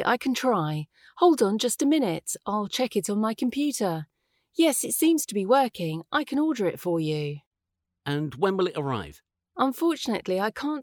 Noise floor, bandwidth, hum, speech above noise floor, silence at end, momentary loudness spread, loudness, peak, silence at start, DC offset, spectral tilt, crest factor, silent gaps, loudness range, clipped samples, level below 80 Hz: -84 dBFS; over 20 kHz; none; 59 dB; 0 s; 11 LU; -26 LUFS; -8 dBFS; 0 s; under 0.1%; -4.5 dB/octave; 18 dB; 7.47-7.51 s; 4 LU; under 0.1%; -66 dBFS